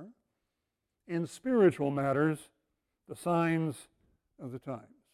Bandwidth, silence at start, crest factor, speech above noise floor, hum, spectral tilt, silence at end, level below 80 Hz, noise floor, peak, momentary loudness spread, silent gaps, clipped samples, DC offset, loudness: 14.5 kHz; 0 s; 20 dB; 55 dB; none; -7.5 dB/octave; 0.35 s; -72 dBFS; -85 dBFS; -14 dBFS; 19 LU; none; under 0.1%; under 0.1%; -31 LUFS